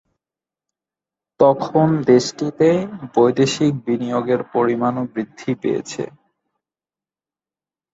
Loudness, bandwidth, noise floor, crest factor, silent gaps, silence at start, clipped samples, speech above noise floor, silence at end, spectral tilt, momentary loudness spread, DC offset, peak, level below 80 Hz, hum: -18 LUFS; 8 kHz; under -90 dBFS; 18 dB; none; 1.4 s; under 0.1%; over 72 dB; 1.85 s; -6 dB/octave; 10 LU; under 0.1%; -2 dBFS; -60 dBFS; none